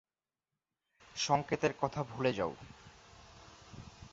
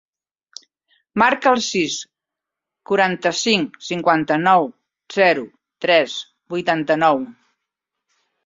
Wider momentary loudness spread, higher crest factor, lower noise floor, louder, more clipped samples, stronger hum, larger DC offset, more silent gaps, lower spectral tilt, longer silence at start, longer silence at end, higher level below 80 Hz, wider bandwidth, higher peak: first, 24 LU vs 13 LU; about the same, 22 dB vs 18 dB; first, under -90 dBFS vs -85 dBFS; second, -35 LUFS vs -18 LUFS; neither; neither; neither; neither; about the same, -4 dB/octave vs -3.5 dB/octave; about the same, 1.15 s vs 1.15 s; second, 0.05 s vs 1.15 s; about the same, -64 dBFS vs -64 dBFS; about the same, 7.6 kHz vs 7.8 kHz; second, -16 dBFS vs -2 dBFS